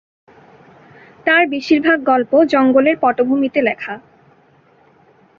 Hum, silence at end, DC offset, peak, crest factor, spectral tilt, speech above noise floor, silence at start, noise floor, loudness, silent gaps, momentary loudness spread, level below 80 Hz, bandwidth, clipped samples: none; 1.4 s; under 0.1%; 0 dBFS; 16 dB; -5.5 dB/octave; 38 dB; 1.25 s; -52 dBFS; -14 LUFS; none; 10 LU; -60 dBFS; 7 kHz; under 0.1%